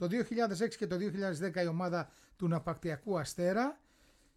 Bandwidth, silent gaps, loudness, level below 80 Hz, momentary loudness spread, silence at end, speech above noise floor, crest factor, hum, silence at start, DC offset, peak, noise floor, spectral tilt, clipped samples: 14 kHz; none; -35 LUFS; -66 dBFS; 6 LU; 0.6 s; 32 dB; 14 dB; none; 0 s; under 0.1%; -20 dBFS; -67 dBFS; -6 dB/octave; under 0.1%